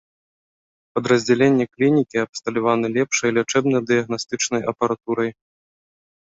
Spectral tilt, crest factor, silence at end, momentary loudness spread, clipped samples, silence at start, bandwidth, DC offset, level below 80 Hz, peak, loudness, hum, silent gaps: -4.5 dB/octave; 18 dB; 1.05 s; 7 LU; under 0.1%; 0.95 s; 8 kHz; under 0.1%; -62 dBFS; -4 dBFS; -20 LUFS; none; 2.29-2.33 s